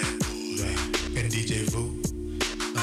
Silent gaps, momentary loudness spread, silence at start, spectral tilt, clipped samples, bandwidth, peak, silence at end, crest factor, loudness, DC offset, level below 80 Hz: none; 4 LU; 0 s; -4 dB/octave; under 0.1%; 15 kHz; -16 dBFS; 0 s; 12 dB; -29 LUFS; under 0.1%; -38 dBFS